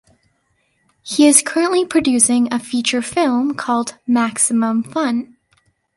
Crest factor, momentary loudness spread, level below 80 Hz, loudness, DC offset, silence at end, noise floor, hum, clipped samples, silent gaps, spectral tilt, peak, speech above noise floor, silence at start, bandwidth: 18 dB; 9 LU; -58 dBFS; -16 LUFS; under 0.1%; 0.7 s; -64 dBFS; none; under 0.1%; none; -2.5 dB/octave; 0 dBFS; 48 dB; 1.05 s; 12 kHz